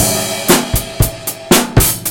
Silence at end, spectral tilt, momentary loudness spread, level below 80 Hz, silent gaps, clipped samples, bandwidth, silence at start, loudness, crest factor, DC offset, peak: 0 s; -3.5 dB/octave; 7 LU; -24 dBFS; none; 0.4%; over 20 kHz; 0 s; -13 LUFS; 14 dB; under 0.1%; 0 dBFS